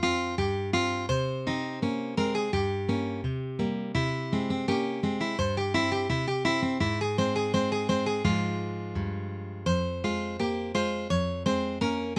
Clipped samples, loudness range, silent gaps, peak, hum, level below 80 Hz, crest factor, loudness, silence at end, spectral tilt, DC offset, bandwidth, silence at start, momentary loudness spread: under 0.1%; 2 LU; none; -12 dBFS; none; -48 dBFS; 16 dB; -29 LUFS; 0 s; -6 dB/octave; under 0.1%; 11 kHz; 0 s; 5 LU